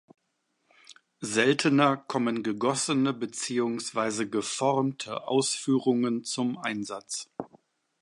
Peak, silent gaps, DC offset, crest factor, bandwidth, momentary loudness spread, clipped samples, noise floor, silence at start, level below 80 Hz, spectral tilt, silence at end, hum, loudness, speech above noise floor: -8 dBFS; none; under 0.1%; 20 dB; 11.5 kHz; 12 LU; under 0.1%; -76 dBFS; 0.9 s; -76 dBFS; -4 dB/octave; 0.55 s; none; -27 LUFS; 49 dB